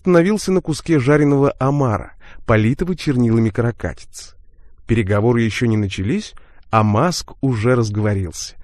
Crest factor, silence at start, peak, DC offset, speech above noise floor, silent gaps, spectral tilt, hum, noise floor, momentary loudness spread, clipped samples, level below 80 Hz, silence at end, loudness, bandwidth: 18 dB; 0.05 s; 0 dBFS; under 0.1%; 25 dB; none; -6.5 dB/octave; none; -41 dBFS; 11 LU; under 0.1%; -38 dBFS; 0 s; -18 LUFS; 13 kHz